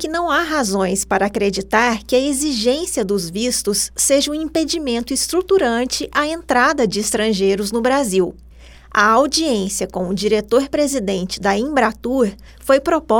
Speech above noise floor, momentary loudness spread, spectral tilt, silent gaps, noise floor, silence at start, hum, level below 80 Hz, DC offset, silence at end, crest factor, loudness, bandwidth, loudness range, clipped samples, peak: 23 dB; 5 LU; -3 dB/octave; none; -40 dBFS; 0 s; none; -42 dBFS; under 0.1%; 0 s; 16 dB; -17 LUFS; over 20 kHz; 1 LU; under 0.1%; -2 dBFS